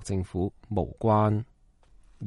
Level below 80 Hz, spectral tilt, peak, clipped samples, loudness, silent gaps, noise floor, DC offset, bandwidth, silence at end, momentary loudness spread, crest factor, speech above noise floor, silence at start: -50 dBFS; -8 dB/octave; -12 dBFS; under 0.1%; -28 LUFS; none; -57 dBFS; under 0.1%; 11.5 kHz; 0 s; 9 LU; 18 dB; 31 dB; 0 s